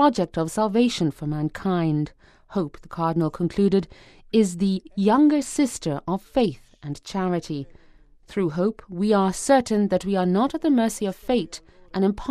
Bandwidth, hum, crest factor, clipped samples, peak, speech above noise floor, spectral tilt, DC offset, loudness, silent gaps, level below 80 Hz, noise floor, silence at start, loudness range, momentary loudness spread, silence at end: 14.5 kHz; none; 18 dB; under 0.1%; -4 dBFS; 30 dB; -6 dB/octave; under 0.1%; -23 LUFS; none; -50 dBFS; -52 dBFS; 0 s; 4 LU; 13 LU; 0 s